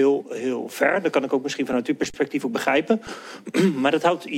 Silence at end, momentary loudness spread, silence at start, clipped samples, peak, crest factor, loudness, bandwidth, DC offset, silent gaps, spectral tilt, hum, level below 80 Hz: 0 s; 7 LU; 0 s; under 0.1%; -4 dBFS; 18 dB; -23 LUFS; 16.5 kHz; under 0.1%; none; -5 dB/octave; none; -62 dBFS